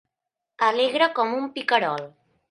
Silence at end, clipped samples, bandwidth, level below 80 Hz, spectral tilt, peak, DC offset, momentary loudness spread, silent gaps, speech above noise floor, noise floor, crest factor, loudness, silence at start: 0.45 s; under 0.1%; 11.5 kHz; -80 dBFS; -4 dB/octave; -6 dBFS; under 0.1%; 9 LU; none; 63 dB; -85 dBFS; 20 dB; -23 LUFS; 0.6 s